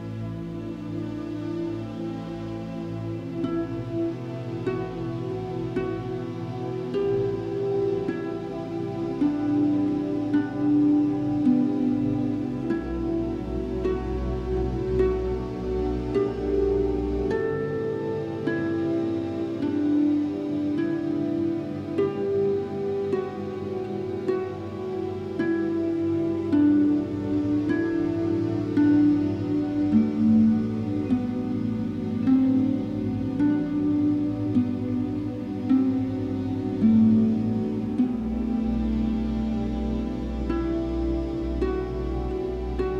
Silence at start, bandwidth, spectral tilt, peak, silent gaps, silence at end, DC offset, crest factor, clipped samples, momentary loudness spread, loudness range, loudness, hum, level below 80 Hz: 0 s; 7.2 kHz; -9 dB/octave; -10 dBFS; none; 0 s; under 0.1%; 16 dB; under 0.1%; 10 LU; 7 LU; -26 LUFS; none; -40 dBFS